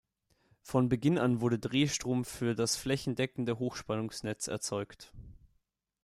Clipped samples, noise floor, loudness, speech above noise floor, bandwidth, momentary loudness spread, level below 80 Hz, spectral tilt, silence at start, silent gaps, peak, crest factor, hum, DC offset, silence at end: under 0.1%; -77 dBFS; -32 LUFS; 45 dB; 15 kHz; 9 LU; -60 dBFS; -5 dB/octave; 0.65 s; none; -14 dBFS; 18 dB; none; under 0.1%; 0.7 s